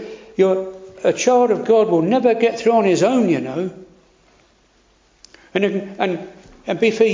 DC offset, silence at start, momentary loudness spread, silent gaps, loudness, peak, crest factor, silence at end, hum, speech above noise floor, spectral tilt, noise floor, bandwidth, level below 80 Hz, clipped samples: under 0.1%; 0 s; 13 LU; none; -18 LUFS; -2 dBFS; 16 dB; 0 s; none; 40 dB; -5.5 dB/octave; -56 dBFS; 7.6 kHz; -60 dBFS; under 0.1%